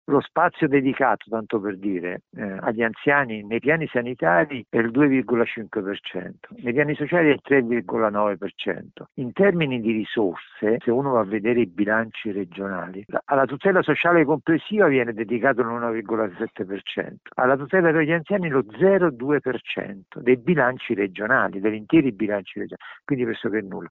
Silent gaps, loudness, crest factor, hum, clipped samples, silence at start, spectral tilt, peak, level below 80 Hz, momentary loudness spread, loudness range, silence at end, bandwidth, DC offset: none; -22 LUFS; 16 dB; none; under 0.1%; 0.1 s; -5 dB/octave; -6 dBFS; -62 dBFS; 11 LU; 3 LU; 0.05 s; 4.1 kHz; under 0.1%